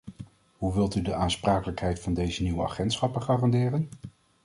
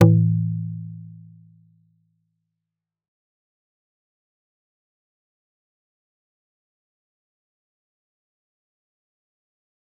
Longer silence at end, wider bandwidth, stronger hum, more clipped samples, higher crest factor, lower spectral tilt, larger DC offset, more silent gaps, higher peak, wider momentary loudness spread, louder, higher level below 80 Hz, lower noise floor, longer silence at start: second, 0.35 s vs 8.9 s; first, 11.5 kHz vs 3.2 kHz; neither; neither; second, 18 dB vs 26 dB; second, -6.5 dB/octave vs -10 dB/octave; neither; neither; second, -10 dBFS vs -2 dBFS; about the same, 21 LU vs 23 LU; second, -28 LUFS vs -22 LUFS; first, -42 dBFS vs -62 dBFS; second, -47 dBFS vs -86 dBFS; about the same, 0.05 s vs 0 s